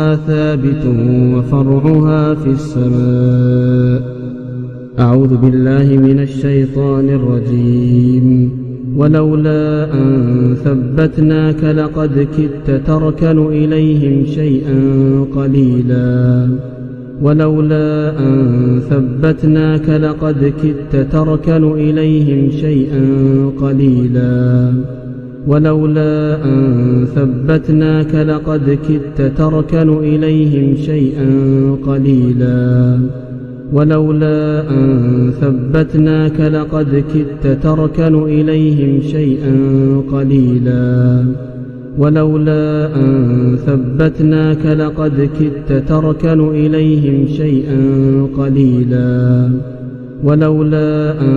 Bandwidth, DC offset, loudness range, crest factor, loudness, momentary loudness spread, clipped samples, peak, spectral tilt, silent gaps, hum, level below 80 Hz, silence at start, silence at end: 4.6 kHz; under 0.1%; 1 LU; 10 dB; -12 LUFS; 4 LU; 0.1%; 0 dBFS; -10.5 dB/octave; none; none; -32 dBFS; 0 s; 0 s